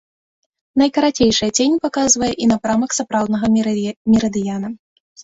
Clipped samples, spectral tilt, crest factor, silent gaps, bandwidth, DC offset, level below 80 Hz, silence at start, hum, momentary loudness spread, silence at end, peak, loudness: under 0.1%; -3.5 dB/octave; 16 dB; 3.96-4.05 s; 8 kHz; under 0.1%; -48 dBFS; 0.75 s; none; 8 LU; 0.45 s; -2 dBFS; -17 LUFS